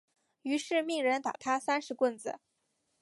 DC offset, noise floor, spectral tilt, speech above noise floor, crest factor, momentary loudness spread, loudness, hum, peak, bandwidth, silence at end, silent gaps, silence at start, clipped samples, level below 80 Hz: under 0.1%; -79 dBFS; -2.5 dB/octave; 47 dB; 16 dB; 12 LU; -32 LUFS; none; -16 dBFS; 11.5 kHz; 0.65 s; none; 0.45 s; under 0.1%; -84 dBFS